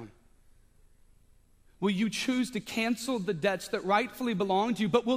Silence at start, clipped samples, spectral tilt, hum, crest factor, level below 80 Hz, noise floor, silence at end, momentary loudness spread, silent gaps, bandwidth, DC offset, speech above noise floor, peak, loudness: 0 s; under 0.1%; -5 dB/octave; none; 20 dB; -62 dBFS; -61 dBFS; 0 s; 5 LU; none; 15.5 kHz; under 0.1%; 32 dB; -10 dBFS; -30 LUFS